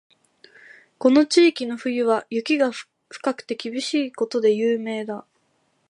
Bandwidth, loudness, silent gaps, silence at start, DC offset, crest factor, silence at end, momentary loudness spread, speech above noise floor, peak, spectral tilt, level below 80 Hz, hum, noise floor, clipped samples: 11.5 kHz; -22 LUFS; none; 1 s; under 0.1%; 18 dB; 0.7 s; 13 LU; 46 dB; -4 dBFS; -4 dB/octave; -78 dBFS; none; -67 dBFS; under 0.1%